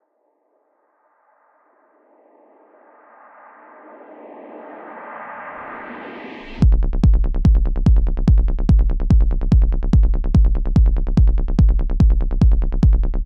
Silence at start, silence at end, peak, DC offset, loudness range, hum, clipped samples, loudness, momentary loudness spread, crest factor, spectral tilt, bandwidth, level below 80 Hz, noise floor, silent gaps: 4.25 s; 0 s; -4 dBFS; under 0.1%; 18 LU; none; under 0.1%; -18 LUFS; 17 LU; 14 dB; -9.5 dB/octave; 5.2 kHz; -18 dBFS; -66 dBFS; none